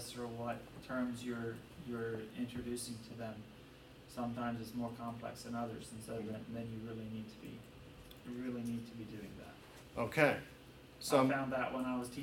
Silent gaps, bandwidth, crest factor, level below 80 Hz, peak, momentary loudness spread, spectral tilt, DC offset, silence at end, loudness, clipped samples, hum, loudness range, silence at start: none; 17 kHz; 24 dB; -66 dBFS; -16 dBFS; 21 LU; -5.5 dB/octave; under 0.1%; 0 s; -41 LUFS; under 0.1%; none; 9 LU; 0 s